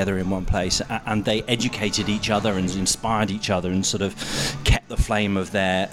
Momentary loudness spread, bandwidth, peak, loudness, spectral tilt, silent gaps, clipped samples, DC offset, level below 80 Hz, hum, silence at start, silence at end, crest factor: 3 LU; 16 kHz; -6 dBFS; -23 LUFS; -4 dB/octave; none; under 0.1%; under 0.1%; -32 dBFS; none; 0 s; 0 s; 18 dB